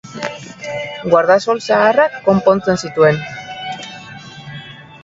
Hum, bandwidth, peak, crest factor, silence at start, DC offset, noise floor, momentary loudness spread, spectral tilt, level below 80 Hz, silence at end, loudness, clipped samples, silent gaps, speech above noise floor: none; 7.8 kHz; 0 dBFS; 16 dB; 0.05 s; under 0.1%; -34 dBFS; 20 LU; -5.5 dB/octave; -52 dBFS; 0.05 s; -15 LUFS; under 0.1%; none; 21 dB